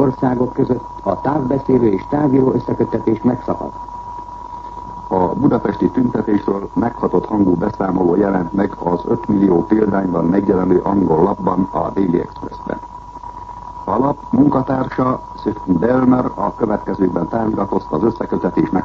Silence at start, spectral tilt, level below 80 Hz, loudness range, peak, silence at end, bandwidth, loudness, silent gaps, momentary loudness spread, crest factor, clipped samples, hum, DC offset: 0 s; -10 dB/octave; -40 dBFS; 4 LU; 0 dBFS; 0 s; 7 kHz; -17 LUFS; none; 14 LU; 16 dB; under 0.1%; none; under 0.1%